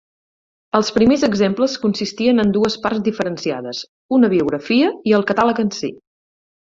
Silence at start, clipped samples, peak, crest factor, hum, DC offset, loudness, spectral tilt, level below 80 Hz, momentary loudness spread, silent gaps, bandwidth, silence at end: 0.75 s; under 0.1%; -2 dBFS; 16 dB; none; under 0.1%; -17 LUFS; -5.5 dB/octave; -52 dBFS; 9 LU; 3.88-4.09 s; 7.6 kHz; 0.7 s